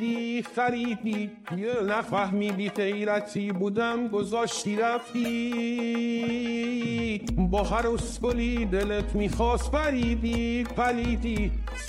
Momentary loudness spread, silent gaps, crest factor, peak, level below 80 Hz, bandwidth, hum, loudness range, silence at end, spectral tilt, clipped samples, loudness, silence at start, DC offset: 4 LU; none; 14 dB; -12 dBFS; -36 dBFS; 13.5 kHz; none; 1 LU; 0 s; -5.5 dB/octave; under 0.1%; -28 LUFS; 0 s; under 0.1%